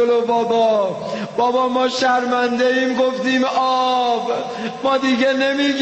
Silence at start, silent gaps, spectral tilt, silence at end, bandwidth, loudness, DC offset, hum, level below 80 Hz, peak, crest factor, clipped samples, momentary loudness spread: 0 s; none; -4 dB/octave; 0 s; 8.4 kHz; -18 LUFS; under 0.1%; none; -62 dBFS; -6 dBFS; 12 dB; under 0.1%; 6 LU